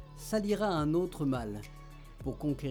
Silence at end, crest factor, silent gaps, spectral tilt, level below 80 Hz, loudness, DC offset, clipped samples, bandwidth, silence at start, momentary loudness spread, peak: 0 s; 14 dB; none; -6.5 dB/octave; -50 dBFS; -33 LUFS; under 0.1%; under 0.1%; over 20 kHz; 0 s; 18 LU; -20 dBFS